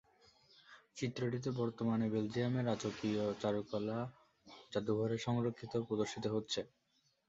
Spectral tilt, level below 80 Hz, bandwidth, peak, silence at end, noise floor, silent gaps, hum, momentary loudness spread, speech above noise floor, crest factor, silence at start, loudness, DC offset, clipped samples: -6 dB/octave; -72 dBFS; 8 kHz; -22 dBFS; 0.6 s; -68 dBFS; none; none; 7 LU; 31 dB; 16 dB; 0.7 s; -39 LUFS; under 0.1%; under 0.1%